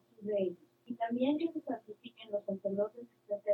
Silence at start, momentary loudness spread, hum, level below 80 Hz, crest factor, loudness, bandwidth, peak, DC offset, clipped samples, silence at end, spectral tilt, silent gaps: 0.2 s; 17 LU; none; -88 dBFS; 16 dB; -37 LUFS; 4.4 kHz; -20 dBFS; under 0.1%; under 0.1%; 0 s; -8.5 dB/octave; none